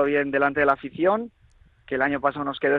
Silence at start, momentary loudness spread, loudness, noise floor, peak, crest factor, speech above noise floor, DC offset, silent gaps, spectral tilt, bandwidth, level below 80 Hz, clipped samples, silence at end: 0 s; 7 LU; -23 LUFS; -56 dBFS; -6 dBFS; 18 dB; 34 dB; under 0.1%; none; -8 dB/octave; 4.9 kHz; -56 dBFS; under 0.1%; 0 s